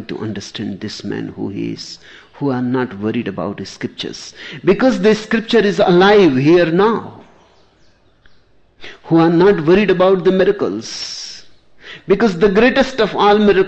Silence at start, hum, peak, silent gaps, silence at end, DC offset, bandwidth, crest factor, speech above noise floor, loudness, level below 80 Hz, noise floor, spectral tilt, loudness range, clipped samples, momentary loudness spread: 0 s; none; -2 dBFS; none; 0 s; under 0.1%; 8.4 kHz; 14 dB; 37 dB; -15 LUFS; -44 dBFS; -51 dBFS; -6 dB/octave; 9 LU; under 0.1%; 16 LU